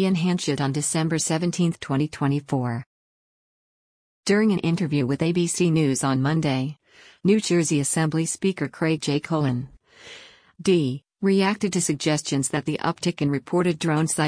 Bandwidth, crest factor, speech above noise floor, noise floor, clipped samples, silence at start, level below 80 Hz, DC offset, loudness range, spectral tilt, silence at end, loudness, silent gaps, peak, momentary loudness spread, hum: 10.5 kHz; 16 dB; 24 dB; -46 dBFS; under 0.1%; 0 s; -60 dBFS; under 0.1%; 3 LU; -5 dB/octave; 0 s; -23 LUFS; 2.86-4.23 s; -8 dBFS; 7 LU; none